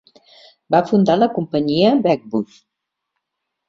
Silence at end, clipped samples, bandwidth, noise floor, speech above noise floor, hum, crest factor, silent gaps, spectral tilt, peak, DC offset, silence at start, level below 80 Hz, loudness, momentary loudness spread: 1.25 s; under 0.1%; 7.4 kHz; -80 dBFS; 63 dB; none; 18 dB; none; -7.5 dB/octave; -2 dBFS; under 0.1%; 0.7 s; -58 dBFS; -17 LUFS; 10 LU